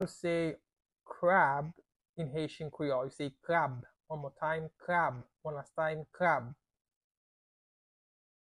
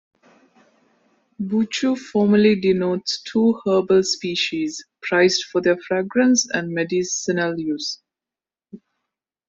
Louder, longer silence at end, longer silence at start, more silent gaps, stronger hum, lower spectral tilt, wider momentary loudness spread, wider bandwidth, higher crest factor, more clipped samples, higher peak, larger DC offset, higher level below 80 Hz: second, -34 LUFS vs -20 LUFS; first, 1.95 s vs 0.7 s; second, 0 s vs 1.4 s; first, 2.09-2.14 s vs none; neither; first, -6.5 dB/octave vs -4 dB/octave; first, 16 LU vs 9 LU; first, 11.5 kHz vs 8 kHz; first, 22 dB vs 16 dB; neither; second, -14 dBFS vs -4 dBFS; neither; second, -70 dBFS vs -62 dBFS